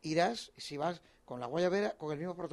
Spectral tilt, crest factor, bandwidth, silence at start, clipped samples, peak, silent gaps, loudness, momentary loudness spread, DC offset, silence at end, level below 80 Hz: -5 dB/octave; 18 dB; 12 kHz; 0.05 s; under 0.1%; -18 dBFS; none; -36 LUFS; 12 LU; under 0.1%; 0 s; -72 dBFS